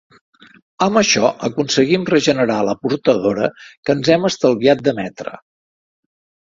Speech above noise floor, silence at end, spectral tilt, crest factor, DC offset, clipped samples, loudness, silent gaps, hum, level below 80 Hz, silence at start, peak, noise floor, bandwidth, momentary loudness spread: over 74 dB; 1.1 s; -4.5 dB/octave; 18 dB; under 0.1%; under 0.1%; -16 LUFS; 3.77-3.83 s; none; -56 dBFS; 0.8 s; 0 dBFS; under -90 dBFS; 7.8 kHz; 10 LU